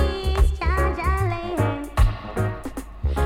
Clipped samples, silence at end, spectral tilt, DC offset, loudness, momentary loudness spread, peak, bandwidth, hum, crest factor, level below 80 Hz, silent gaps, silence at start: under 0.1%; 0 s; -6.5 dB/octave; under 0.1%; -24 LUFS; 6 LU; -6 dBFS; 15.5 kHz; none; 16 dB; -24 dBFS; none; 0 s